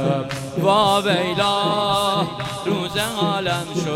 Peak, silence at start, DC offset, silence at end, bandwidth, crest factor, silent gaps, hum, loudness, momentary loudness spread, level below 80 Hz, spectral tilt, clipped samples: -4 dBFS; 0 s; under 0.1%; 0 s; 16.5 kHz; 16 dB; none; none; -20 LUFS; 7 LU; -50 dBFS; -4.5 dB/octave; under 0.1%